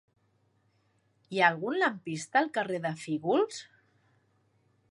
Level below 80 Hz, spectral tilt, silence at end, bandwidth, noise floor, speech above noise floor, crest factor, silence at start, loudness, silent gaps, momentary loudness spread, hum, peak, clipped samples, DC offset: -82 dBFS; -4.5 dB/octave; 1.3 s; 11.5 kHz; -71 dBFS; 42 dB; 24 dB; 1.3 s; -29 LUFS; none; 10 LU; none; -8 dBFS; under 0.1%; under 0.1%